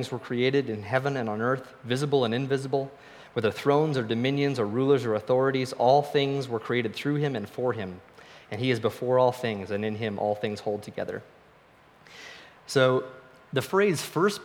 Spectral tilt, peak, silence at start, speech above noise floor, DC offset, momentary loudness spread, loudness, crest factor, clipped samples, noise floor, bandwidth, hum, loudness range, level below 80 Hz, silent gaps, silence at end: -6 dB/octave; -8 dBFS; 0 s; 30 dB; under 0.1%; 12 LU; -27 LUFS; 20 dB; under 0.1%; -57 dBFS; 17 kHz; none; 6 LU; -70 dBFS; none; 0 s